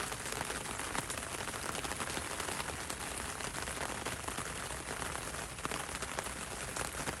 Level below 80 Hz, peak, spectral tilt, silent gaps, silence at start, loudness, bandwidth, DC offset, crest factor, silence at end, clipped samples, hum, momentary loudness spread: -54 dBFS; -18 dBFS; -2.5 dB/octave; none; 0 s; -39 LUFS; 16 kHz; under 0.1%; 22 dB; 0 s; under 0.1%; none; 2 LU